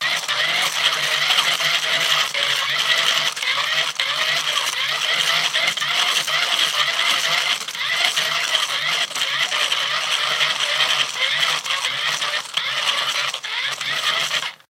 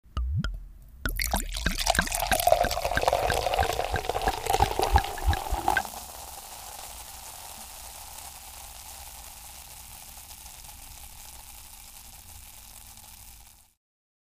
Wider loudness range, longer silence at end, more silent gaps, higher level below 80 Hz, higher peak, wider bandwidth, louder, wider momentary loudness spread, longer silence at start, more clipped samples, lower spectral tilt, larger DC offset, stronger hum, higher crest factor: second, 2 LU vs 18 LU; second, 0.15 s vs 0.75 s; neither; second, -80 dBFS vs -38 dBFS; first, 0 dBFS vs -6 dBFS; about the same, 17 kHz vs 16 kHz; first, -18 LUFS vs -28 LUFS; second, 4 LU vs 20 LU; about the same, 0 s vs 0.05 s; neither; second, 1.5 dB/octave vs -3 dB/octave; neither; neither; second, 20 dB vs 26 dB